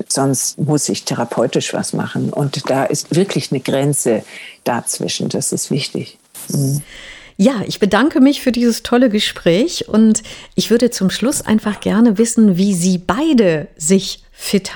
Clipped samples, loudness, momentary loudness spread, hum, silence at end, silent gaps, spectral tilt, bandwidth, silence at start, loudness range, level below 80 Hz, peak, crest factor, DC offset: under 0.1%; -16 LUFS; 8 LU; none; 0 s; none; -4.5 dB/octave; 20 kHz; 0 s; 5 LU; -48 dBFS; 0 dBFS; 16 dB; under 0.1%